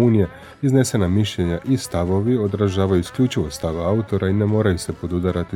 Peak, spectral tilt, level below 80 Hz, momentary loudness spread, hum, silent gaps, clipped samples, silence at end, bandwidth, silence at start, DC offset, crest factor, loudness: -4 dBFS; -6.5 dB/octave; -42 dBFS; 6 LU; none; none; under 0.1%; 0 s; 15.5 kHz; 0 s; under 0.1%; 16 dB; -20 LUFS